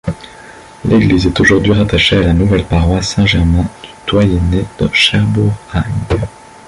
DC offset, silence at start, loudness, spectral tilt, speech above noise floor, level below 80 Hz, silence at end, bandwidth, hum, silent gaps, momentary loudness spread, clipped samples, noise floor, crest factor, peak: under 0.1%; 0.05 s; -12 LUFS; -6 dB/octave; 24 dB; -24 dBFS; 0.4 s; 11.5 kHz; none; none; 9 LU; under 0.1%; -35 dBFS; 12 dB; 0 dBFS